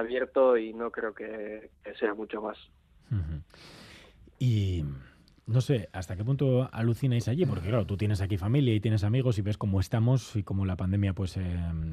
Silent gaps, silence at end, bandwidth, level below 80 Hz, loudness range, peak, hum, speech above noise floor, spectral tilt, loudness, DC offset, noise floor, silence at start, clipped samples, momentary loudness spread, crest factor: none; 0 s; 13.5 kHz; -52 dBFS; 8 LU; -14 dBFS; none; 25 dB; -8 dB/octave; -29 LUFS; under 0.1%; -54 dBFS; 0 s; under 0.1%; 13 LU; 16 dB